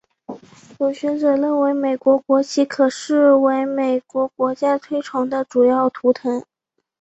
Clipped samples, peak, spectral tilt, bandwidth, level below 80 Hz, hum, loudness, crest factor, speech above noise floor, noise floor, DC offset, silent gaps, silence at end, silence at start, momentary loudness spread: under 0.1%; -4 dBFS; -4.5 dB/octave; 8.2 kHz; -66 dBFS; none; -18 LUFS; 16 dB; 21 dB; -38 dBFS; under 0.1%; none; 0.6 s; 0.3 s; 8 LU